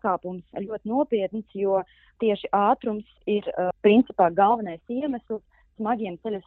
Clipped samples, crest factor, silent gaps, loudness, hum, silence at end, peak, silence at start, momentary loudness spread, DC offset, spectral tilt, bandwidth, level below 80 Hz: under 0.1%; 20 dB; none; -25 LUFS; none; 0.05 s; -6 dBFS; 0.05 s; 13 LU; under 0.1%; -5 dB/octave; 4.2 kHz; -62 dBFS